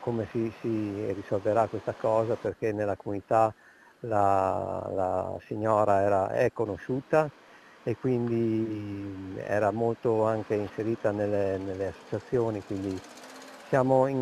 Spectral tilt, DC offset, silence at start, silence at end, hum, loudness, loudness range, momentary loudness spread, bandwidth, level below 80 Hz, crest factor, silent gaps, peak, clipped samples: -8 dB/octave; under 0.1%; 0 s; 0 s; none; -29 LUFS; 3 LU; 11 LU; 14 kHz; -64 dBFS; 18 dB; none; -10 dBFS; under 0.1%